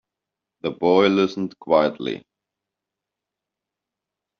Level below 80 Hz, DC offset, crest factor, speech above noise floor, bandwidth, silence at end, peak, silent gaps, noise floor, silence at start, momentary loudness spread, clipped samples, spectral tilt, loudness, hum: -66 dBFS; under 0.1%; 20 dB; 66 dB; 6.8 kHz; 2.2 s; -4 dBFS; none; -86 dBFS; 0.65 s; 14 LU; under 0.1%; -4 dB/octave; -21 LUFS; none